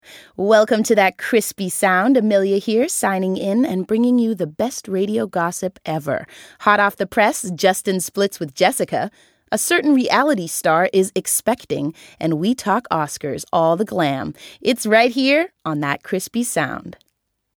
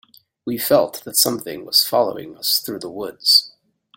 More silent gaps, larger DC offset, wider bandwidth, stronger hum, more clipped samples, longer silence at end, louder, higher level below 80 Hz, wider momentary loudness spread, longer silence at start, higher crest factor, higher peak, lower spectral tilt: neither; neither; first, 19.5 kHz vs 17 kHz; neither; neither; first, 0.65 s vs 0.5 s; about the same, -18 LUFS vs -17 LUFS; about the same, -60 dBFS vs -64 dBFS; second, 10 LU vs 15 LU; second, 0.1 s vs 0.45 s; about the same, 18 dB vs 20 dB; about the same, 0 dBFS vs -2 dBFS; first, -4 dB/octave vs -2 dB/octave